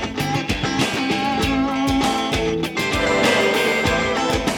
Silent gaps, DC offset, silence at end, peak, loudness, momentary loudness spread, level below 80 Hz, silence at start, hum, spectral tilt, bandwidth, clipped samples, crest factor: none; under 0.1%; 0 s; -6 dBFS; -19 LUFS; 5 LU; -36 dBFS; 0 s; none; -4 dB/octave; 19.5 kHz; under 0.1%; 14 dB